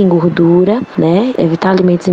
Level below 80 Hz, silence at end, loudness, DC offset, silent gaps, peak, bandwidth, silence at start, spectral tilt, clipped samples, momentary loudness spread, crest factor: -48 dBFS; 0 s; -11 LUFS; under 0.1%; none; 0 dBFS; 7.8 kHz; 0 s; -8.5 dB/octave; under 0.1%; 4 LU; 10 dB